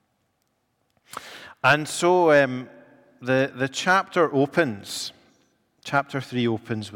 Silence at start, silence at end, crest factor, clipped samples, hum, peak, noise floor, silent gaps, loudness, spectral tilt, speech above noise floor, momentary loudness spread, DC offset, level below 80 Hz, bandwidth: 1.15 s; 0 s; 18 dB; under 0.1%; none; -6 dBFS; -72 dBFS; none; -22 LUFS; -4.5 dB/octave; 50 dB; 20 LU; under 0.1%; -68 dBFS; 17.5 kHz